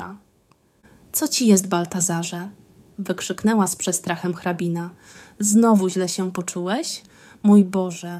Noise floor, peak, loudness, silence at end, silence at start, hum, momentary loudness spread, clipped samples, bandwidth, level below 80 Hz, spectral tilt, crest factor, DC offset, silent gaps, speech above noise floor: -60 dBFS; -4 dBFS; -21 LUFS; 0 s; 0 s; none; 14 LU; under 0.1%; 15.5 kHz; -64 dBFS; -4.5 dB/octave; 18 dB; under 0.1%; none; 39 dB